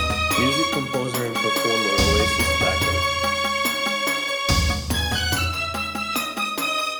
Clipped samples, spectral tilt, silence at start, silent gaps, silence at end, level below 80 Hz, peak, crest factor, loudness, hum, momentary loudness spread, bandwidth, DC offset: under 0.1%; -3.5 dB/octave; 0 s; none; 0 s; -34 dBFS; -4 dBFS; 18 dB; -21 LUFS; none; 6 LU; over 20 kHz; under 0.1%